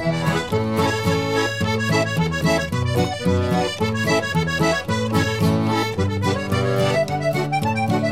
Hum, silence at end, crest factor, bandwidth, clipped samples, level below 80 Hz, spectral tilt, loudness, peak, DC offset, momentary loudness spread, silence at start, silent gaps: none; 0 s; 14 dB; 16 kHz; under 0.1%; -44 dBFS; -5.5 dB/octave; -20 LUFS; -6 dBFS; 0.5%; 2 LU; 0 s; none